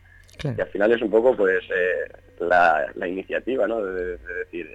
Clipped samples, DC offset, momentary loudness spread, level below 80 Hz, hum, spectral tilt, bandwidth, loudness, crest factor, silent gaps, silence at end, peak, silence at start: under 0.1%; under 0.1%; 13 LU; -50 dBFS; none; -7 dB/octave; 9 kHz; -23 LUFS; 16 dB; none; 0.05 s; -6 dBFS; 0.4 s